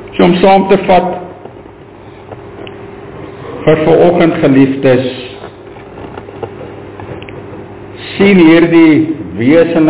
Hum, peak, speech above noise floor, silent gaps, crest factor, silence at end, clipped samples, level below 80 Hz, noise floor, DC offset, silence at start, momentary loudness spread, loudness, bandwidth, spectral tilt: none; 0 dBFS; 26 dB; none; 10 dB; 0 s; 0.2%; -40 dBFS; -33 dBFS; under 0.1%; 0 s; 23 LU; -8 LUFS; 4 kHz; -11 dB/octave